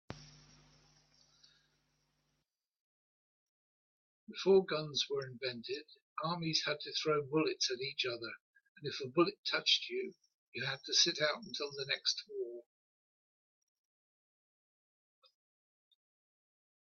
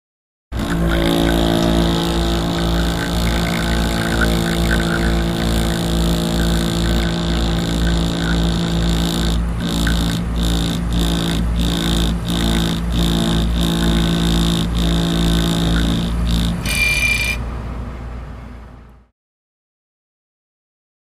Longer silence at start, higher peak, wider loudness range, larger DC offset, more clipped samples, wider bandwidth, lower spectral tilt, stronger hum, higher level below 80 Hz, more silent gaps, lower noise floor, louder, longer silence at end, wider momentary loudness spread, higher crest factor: second, 0.1 s vs 0.5 s; second, -16 dBFS vs -2 dBFS; first, 8 LU vs 3 LU; neither; neither; second, 7.4 kHz vs 15.5 kHz; second, -3 dB/octave vs -5 dB/octave; second, none vs 60 Hz at -35 dBFS; second, -80 dBFS vs -22 dBFS; first, 2.80-4.27 s, 6.02-6.16 s, 8.40-8.53 s, 8.69-8.75 s, 9.38-9.43 s, 10.34-10.52 s vs none; first, -86 dBFS vs -39 dBFS; second, -35 LUFS vs -18 LUFS; first, 4.3 s vs 2.2 s; first, 17 LU vs 4 LU; first, 24 dB vs 16 dB